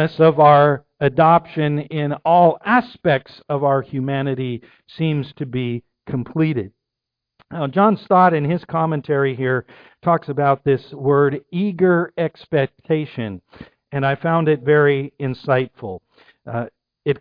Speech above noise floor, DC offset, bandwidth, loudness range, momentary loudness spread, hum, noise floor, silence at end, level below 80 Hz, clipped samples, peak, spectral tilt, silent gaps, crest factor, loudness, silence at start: 65 dB; under 0.1%; 5.2 kHz; 6 LU; 14 LU; none; -83 dBFS; 0.05 s; -58 dBFS; under 0.1%; -2 dBFS; -10.5 dB/octave; none; 16 dB; -18 LUFS; 0 s